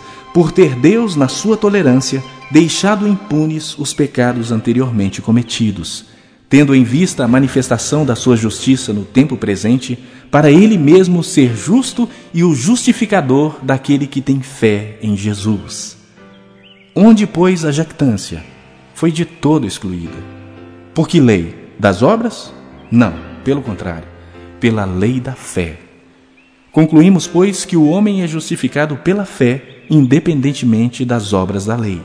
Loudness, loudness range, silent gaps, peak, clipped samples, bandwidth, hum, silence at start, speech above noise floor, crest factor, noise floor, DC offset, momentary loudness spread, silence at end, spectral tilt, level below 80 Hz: -13 LUFS; 6 LU; none; 0 dBFS; 0.4%; 11 kHz; none; 0 s; 35 dB; 14 dB; -48 dBFS; under 0.1%; 13 LU; 0 s; -6 dB/octave; -44 dBFS